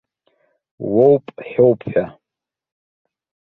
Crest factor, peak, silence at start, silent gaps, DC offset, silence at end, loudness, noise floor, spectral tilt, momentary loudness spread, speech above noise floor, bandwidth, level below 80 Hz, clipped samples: 18 dB; 0 dBFS; 0.8 s; none; under 0.1%; 1.35 s; -17 LUFS; -86 dBFS; -11 dB/octave; 14 LU; 70 dB; 4.1 kHz; -58 dBFS; under 0.1%